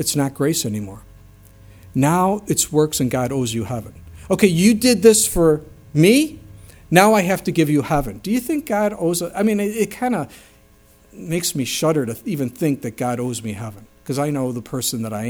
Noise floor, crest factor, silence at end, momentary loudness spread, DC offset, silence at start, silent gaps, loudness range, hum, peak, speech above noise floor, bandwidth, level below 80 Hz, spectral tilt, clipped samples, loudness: -51 dBFS; 20 dB; 0 s; 13 LU; under 0.1%; 0 s; none; 7 LU; none; 0 dBFS; 33 dB; over 20 kHz; -44 dBFS; -4.5 dB/octave; under 0.1%; -19 LUFS